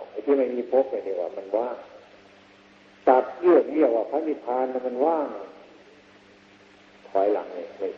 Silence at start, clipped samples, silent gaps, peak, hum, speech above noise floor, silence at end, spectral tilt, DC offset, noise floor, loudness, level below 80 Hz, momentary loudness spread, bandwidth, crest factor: 0 s; under 0.1%; none; -4 dBFS; none; 29 dB; 0 s; -7 dB/octave; under 0.1%; -53 dBFS; -24 LUFS; -74 dBFS; 13 LU; 6.4 kHz; 22 dB